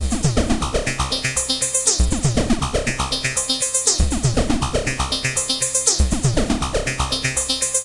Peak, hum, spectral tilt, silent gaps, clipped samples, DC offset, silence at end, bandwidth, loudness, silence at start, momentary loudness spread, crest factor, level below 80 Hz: -2 dBFS; none; -3 dB/octave; none; under 0.1%; under 0.1%; 0 s; 11.5 kHz; -19 LUFS; 0 s; 5 LU; 18 dB; -26 dBFS